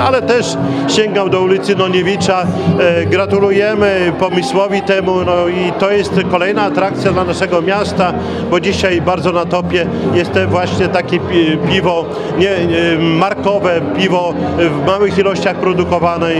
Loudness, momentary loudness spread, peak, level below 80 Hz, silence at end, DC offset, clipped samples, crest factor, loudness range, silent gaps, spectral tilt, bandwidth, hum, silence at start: -13 LUFS; 3 LU; 0 dBFS; -46 dBFS; 0 s; under 0.1%; under 0.1%; 12 dB; 2 LU; none; -6 dB/octave; 11 kHz; none; 0 s